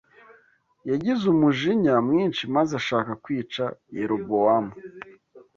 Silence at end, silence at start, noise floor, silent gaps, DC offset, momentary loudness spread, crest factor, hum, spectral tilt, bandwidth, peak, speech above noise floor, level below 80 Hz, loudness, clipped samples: 0.15 s; 0.85 s; -61 dBFS; none; under 0.1%; 17 LU; 16 dB; none; -6.5 dB/octave; 7.2 kHz; -8 dBFS; 38 dB; -64 dBFS; -23 LUFS; under 0.1%